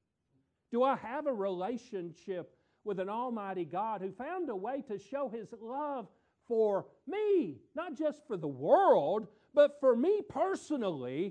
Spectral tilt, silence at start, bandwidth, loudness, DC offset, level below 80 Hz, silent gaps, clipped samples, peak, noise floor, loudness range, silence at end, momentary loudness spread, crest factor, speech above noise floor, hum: -6.5 dB/octave; 0.7 s; 9.6 kHz; -33 LUFS; under 0.1%; -78 dBFS; none; under 0.1%; -14 dBFS; -77 dBFS; 8 LU; 0 s; 15 LU; 20 dB; 45 dB; none